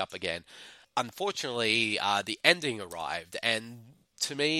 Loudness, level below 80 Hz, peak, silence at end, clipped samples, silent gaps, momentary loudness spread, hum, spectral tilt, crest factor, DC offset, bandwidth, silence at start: -29 LUFS; -70 dBFS; -4 dBFS; 0 s; under 0.1%; none; 12 LU; none; -2.5 dB/octave; 28 dB; under 0.1%; 16.5 kHz; 0 s